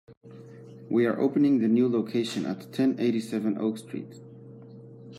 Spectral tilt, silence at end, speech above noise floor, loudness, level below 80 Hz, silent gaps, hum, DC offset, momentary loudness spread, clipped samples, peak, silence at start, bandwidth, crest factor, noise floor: -7 dB/octave; 0 s; 21 dB; -26 LUFS; -76 dBFS; 0.17-0.21 s; none; under 0.1%; 24 LU; under 0.1%; -12 dBFS; 0.1 s; 12.5 kHz; 14 dB; -46 dBFS